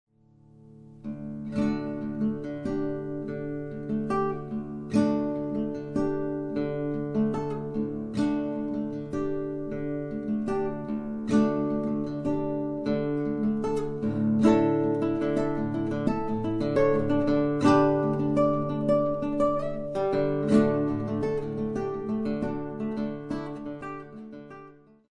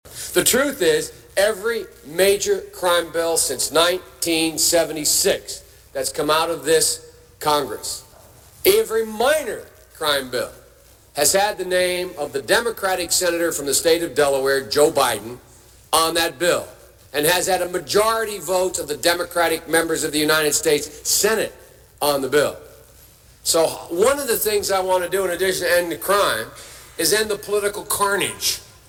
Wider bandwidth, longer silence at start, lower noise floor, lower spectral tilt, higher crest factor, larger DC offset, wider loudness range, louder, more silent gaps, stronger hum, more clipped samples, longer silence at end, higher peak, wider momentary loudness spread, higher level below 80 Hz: second, 10 kHz vs 18 kHz; first, 0.6 s vs 0.05 s; first, -57 dBFS vs -50 dBFS; first, -8.5 dB/octave vs -2 dB/octave; about the same, 20 dB vs 20 dB; neither; first, 7 LU vs 3 LU; second, -28 LUFS vs -19 LUFS; neither; neither; neither; first, 0.4 s vs 0.25 s; second, -8 dBFS vs -2 dBFS; about the same, 11 LU vs 9 LU; about the same, -50 dBFS vs -50 dBFS